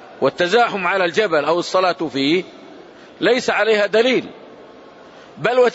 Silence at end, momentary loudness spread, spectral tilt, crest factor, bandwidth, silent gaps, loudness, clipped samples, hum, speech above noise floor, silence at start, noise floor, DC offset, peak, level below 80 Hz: 0 s; 6 LU; -4 dB/octave; 16 dB; 8 kHz; none; -17 LUFS; under 0.1%; none; 25 dB; 0 s; -42 dBFS; under 0.1%; -4 dBFS; -66 dBFS